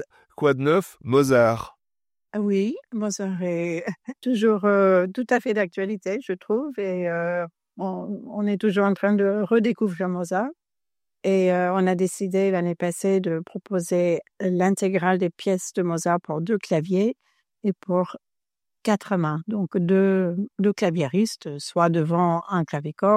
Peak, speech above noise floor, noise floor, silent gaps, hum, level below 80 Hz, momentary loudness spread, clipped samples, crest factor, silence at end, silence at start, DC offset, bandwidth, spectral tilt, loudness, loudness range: -6 dBFS; over 68 dB; under -90 dBFS; none; none; -68 dBFS; 10 LU; under 0.1%; 18 dB; 0 s; 0 s; under 0.1%; 14.5 kHz; -6.5 dB/octave; -23 LUFS; 3 LU